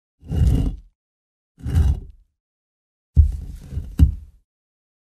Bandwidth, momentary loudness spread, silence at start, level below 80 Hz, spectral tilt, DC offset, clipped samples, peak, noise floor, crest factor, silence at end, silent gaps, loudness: 8.8 kHz; 15 LU; 0.25 s; -24 dBFS; -8.5 dB/octave; under 0.1%; under 0.1%; -2 dBFS; under -90 dBFS; 20 dB; 0.9 s; 0.95-1.55 s, 2.40-3.13 s; -21 LUFS